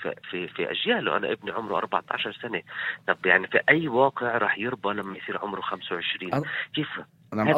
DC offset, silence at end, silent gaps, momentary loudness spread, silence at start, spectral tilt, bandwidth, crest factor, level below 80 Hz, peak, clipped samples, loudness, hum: under 0.1%; 0 s; none; 12 LU; 0 s; -6.5 dB/octave; 16 kHz; 22 dB; -68 dBFS; -4 dBFS; under 0.1%; -26 LUFS; none